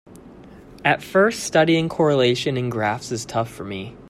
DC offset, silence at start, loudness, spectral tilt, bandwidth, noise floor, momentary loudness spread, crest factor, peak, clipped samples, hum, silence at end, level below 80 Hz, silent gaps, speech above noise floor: under 0.1%; 0.1 s; -20 LUFS; -5 dB/octave; 15.5 kHz; -43 dBFS; 10 LU; 20 dB; -2 dBFS; under 0.1%; none; 0 s; -54 dBFS; none; 23 dB